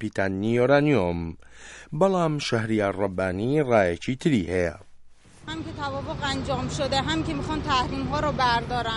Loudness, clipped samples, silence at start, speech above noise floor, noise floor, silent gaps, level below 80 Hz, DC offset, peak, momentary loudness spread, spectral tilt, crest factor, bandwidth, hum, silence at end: -25 LUFS; under 0.1%; 0 s; 23 dB; -48 dBFS; none; -44 dBFS; under 0.1%; -8 dBFS; 13 LU; -6 dB/octave; 18 dB; 11.5 kHz; none; 0 s